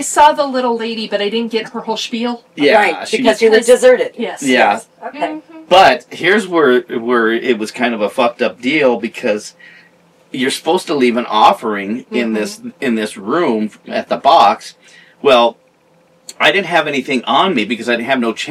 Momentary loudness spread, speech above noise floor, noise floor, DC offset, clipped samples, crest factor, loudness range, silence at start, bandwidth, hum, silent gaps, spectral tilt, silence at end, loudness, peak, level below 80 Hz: 11 LU; 38 dB; -52 dBFS; under 0.1%; under 0.1%; 14 dB; 4 LU; 0 s; 15 kHz; none; none; -3.5 dB/octave; 0 s; -14 LUFS; 0 dBFS; -58 dBFS